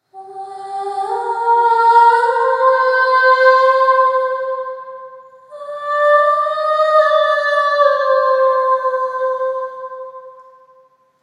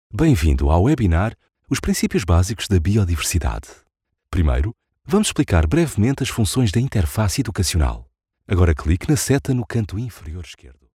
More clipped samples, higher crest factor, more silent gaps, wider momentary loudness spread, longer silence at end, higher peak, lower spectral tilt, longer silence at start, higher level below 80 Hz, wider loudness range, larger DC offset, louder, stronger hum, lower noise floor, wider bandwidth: neither; about the same, 16 dB vs 16 dB; neither; first, 20 LU vs 10 LU; first, 0.8 s vs 0.3 s; first, 0 dBFS vs -4 dBFS; second, -1.5 dB/octave vs -5.5 dB/octave; about the same, 0.15 s vs 0.15 s; second, -88 dBFS vs -28 dBFS; first, 5 LU vs 2 LU; neither; first, -14 LUFS vs -20 LUFS; neither; first, -52 dBFS vs -39 dBFS; second, 9.8 kHz vs 15.5 kHz